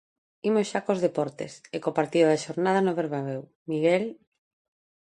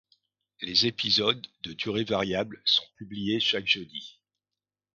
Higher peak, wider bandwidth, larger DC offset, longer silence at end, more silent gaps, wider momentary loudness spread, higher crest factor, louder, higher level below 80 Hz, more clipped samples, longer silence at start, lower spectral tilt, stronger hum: about the same, -8 dBFS vs -8 dBFS; first, 11 kHz vs 7.6 kHz; neither; first, 1 s vs 0.85 s; first, 3.55-3.66 s vs none; second, 12 LU vs 16 LU; about the same, 18 dB vs 22 dB; about the same, -26 LUFS vs -26 LUFS; second, -74 dBFS vs -62 dBFS; neither; second, 0.45 s vs 0.6 s; first, -6 dB/octave vs -4 dB/octave; second, none vs 50 Hz at -55 dBFS